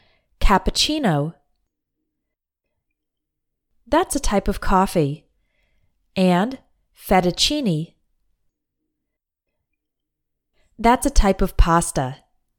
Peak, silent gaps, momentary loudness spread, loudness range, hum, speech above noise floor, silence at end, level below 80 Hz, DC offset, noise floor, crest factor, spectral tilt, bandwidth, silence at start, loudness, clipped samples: -2 dBFS; none; 11 LU; 5 LU; none; 62 dB; 0.45 s; -28 dBFS; under 0.1%; -81 dBFS; 20 dB; -4.5 dB/octave; 18 kHz; 0.4 s; -20 LUFS; under 0.1%